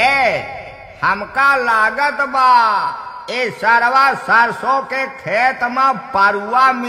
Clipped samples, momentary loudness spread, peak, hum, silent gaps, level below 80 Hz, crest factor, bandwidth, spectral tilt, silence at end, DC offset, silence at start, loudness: under 0.1%; 11 LU; 0 dBFS; none; none; -52 dBFS; 14 dB; 14 kHz; -3.5 dB/octave; 0 s; under 0.1%; 0 s; -14 LUFS